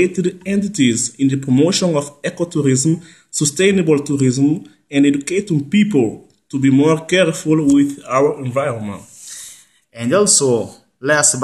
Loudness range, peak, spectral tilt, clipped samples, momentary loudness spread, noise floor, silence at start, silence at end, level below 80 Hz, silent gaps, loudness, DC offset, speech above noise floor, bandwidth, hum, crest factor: 2 LU; 0 dBFS; -4.5 dB/octave; under 0.1%; 12 LU; -42 dBFS; 0 s; 0 s; -56 dBFS; none; -16 LUFS; under 0.1%; 27 dB; 12.5 kHz; none; 16 dB